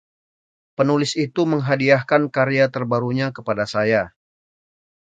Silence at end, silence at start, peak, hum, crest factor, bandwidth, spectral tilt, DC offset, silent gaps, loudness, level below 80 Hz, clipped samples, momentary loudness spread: 1.05 s; 0.8 s; 0 dBFS; none; 20 dB; 9.2 kHz; -6 dB/octave; under 0.1%; none; -19 LUFS; -60 dBFS; under 0.1%; 7 LU